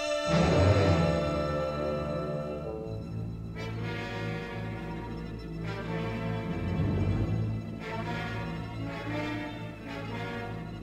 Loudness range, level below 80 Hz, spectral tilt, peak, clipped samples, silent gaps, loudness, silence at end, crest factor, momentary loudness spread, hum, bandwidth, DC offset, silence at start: 7 LU; -44 dBFS; -7 dB/octave; -12 dBFS; under 0.1%; none; -32 LUFS; 0 s; 20 dB; 13 LU; none; 10 kHz; under 0.1%; 0 s